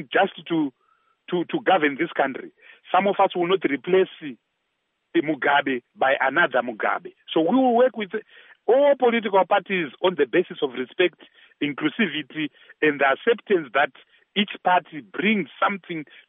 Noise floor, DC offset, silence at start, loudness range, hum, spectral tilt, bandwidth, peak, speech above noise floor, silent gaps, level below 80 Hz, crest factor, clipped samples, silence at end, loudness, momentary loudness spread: -75 dBFS; under 0.1%; 0 s; 3 LU; none; -2.5 dB/octave; 3.9 kHz; -6 dBFS; 53 dB; none; -82 dBFS; 16 dB; under 0.1%; 0.25 s; -22 LUFS; 11 LU